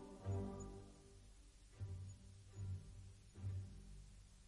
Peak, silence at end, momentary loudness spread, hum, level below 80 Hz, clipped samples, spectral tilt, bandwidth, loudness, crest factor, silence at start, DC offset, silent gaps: -34 dBFS; 0 s; 18 LU; none; -62 dBFS; under 0.1%; -7 dB/octave; 11.5 kHz; -53 LUFS; 18 dB; 0 s; under 0.1%; none